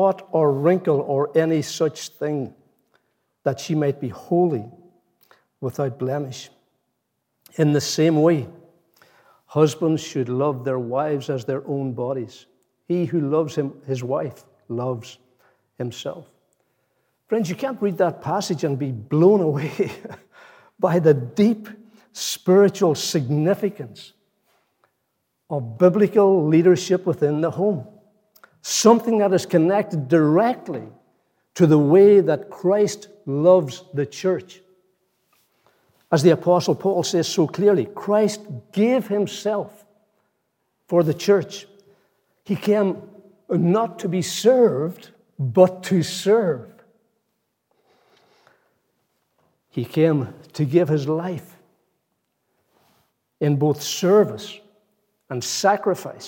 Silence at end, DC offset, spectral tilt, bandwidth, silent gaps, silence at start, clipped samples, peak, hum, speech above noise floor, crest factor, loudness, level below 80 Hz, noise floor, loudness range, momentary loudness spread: 0 s; under 0.1%; -6 dB/octave; 17 kHz; none; 0 s; under 0.1%; -2 dBFS; none; 55 dB; 20 dB; -20 LUFS; -74 dBFS; -75 dBFS; 8 LU; 14 LU